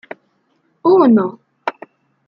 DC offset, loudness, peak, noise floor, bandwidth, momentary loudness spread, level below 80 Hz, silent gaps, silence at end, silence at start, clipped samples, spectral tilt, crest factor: under 0.1%; -15 LUFS; -2 dBFS; -62 dBFS; 5.6 kHz; 16 LU; -66 dBFS; none; 0.55 s; 0.85 s; under 0.1%; -9 dB/octave; 14 dB